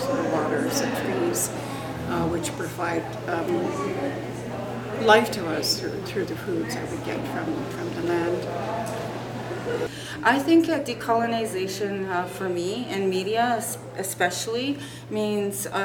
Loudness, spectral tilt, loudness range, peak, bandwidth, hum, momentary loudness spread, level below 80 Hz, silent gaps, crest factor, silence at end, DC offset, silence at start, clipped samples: -26 LUFS; -4.5 dB/octave; 4 LU; -4 dBFS; 18.5 kHz; none; 10 LU; -54 dBFS; none; 22 dB; 0 s; under 0.1%; 0 s; under 0.1%